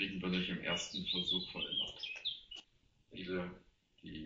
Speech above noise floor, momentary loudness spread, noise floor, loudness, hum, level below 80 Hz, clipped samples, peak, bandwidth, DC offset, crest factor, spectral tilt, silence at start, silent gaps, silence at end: 32 dB; 16 LU; -72 dBFS; -38 LUFS; none; -66 dBFS; under 0.1%; -22 dBFS; 7.6 kHz; under 0.1%; 18 dB; -2.5 dB/octave; 0 s; none; 0 s